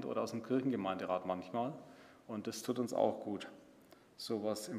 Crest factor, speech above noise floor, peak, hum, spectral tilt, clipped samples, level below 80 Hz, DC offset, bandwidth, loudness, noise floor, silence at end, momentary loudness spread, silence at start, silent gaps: 22 dB; 25 dB; -18 dBFS; none; -5.5 dB/octave; under 0.1%; -84 dBFS; under 0.1%; 15.5 kHz; -39 LUFS; -63 dBFS; 0 s; 14 LU; 0 s; none